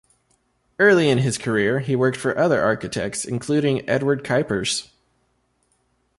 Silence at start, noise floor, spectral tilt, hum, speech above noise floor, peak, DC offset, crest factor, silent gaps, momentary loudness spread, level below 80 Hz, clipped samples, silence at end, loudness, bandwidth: 0.8 s; -67 dBFS; -5 dB/octave; none; 47 dB; -4 dBFS; under 0.1%; 18 dB; none; 9 LU; -56 dBFS; under 0.1%; 1.35 s; -20 LUFS; 11.5 kHz